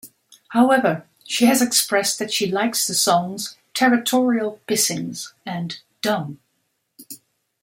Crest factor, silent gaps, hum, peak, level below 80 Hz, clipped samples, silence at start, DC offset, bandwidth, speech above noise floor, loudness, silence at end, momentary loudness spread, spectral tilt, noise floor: 18 dB; none; none; -4 dBFS; -68 dBFS; under 0.1%; 0.05 s; under 0.1%; 16.5 kHz; 52 dB; -20 LUFS; 0.45 s; 15 LU; -3 dB/octave; -71 dBFS